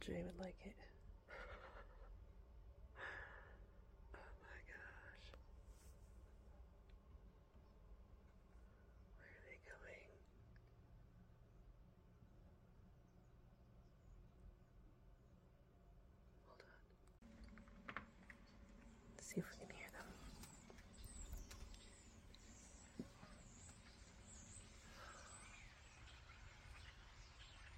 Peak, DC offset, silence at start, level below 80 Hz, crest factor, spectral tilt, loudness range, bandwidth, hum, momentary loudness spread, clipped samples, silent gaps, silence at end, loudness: -32 dBFS; under 0.1%; 0 s; -64 dBFS; 28 dB; -4.5 dB/octave; 13 LU; 16 kHz; none; 14 LU; under 0.1%; none; 0 s; -61 LUFS